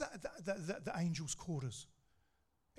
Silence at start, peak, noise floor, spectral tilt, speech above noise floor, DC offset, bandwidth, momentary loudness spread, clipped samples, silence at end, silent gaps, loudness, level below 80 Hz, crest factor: 0 s; -26 dBFS; -81 dBFS; -5 dB/octave; 39 dB; under 0.1%; 13 kHz; 9 LU; under 0.1%; 0.9 s; none; -43 LUFS; -68 dBFS; 18 dB